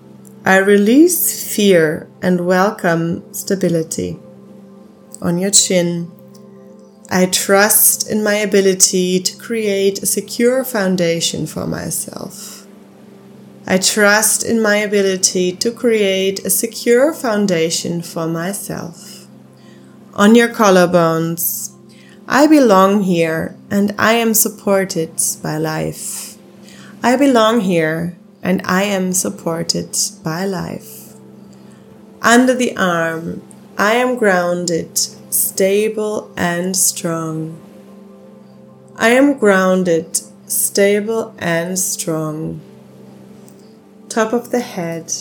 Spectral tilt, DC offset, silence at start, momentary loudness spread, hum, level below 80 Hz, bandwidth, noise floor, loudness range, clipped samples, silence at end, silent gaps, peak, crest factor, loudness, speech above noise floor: -3.5 dB/octave; under 0.1%; 0.15 s; 14 LU; none; -58 dBFS; 19 kHz; -42 dBFS; 6 LU; under 0.1%; 0 s; none; 0 dBFS; 16 dB; -15 LUFS; 27 dB